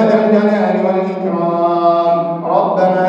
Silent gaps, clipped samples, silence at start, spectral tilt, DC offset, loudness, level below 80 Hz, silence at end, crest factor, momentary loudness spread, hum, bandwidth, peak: none; under 0.1%; 0 s; -8.5 dB/octave; under 0.1%; -14 LUFS; -68 dBFS; 0 s; 12 dB; 5 LU; none; 7.2 kHz; 0 dBFS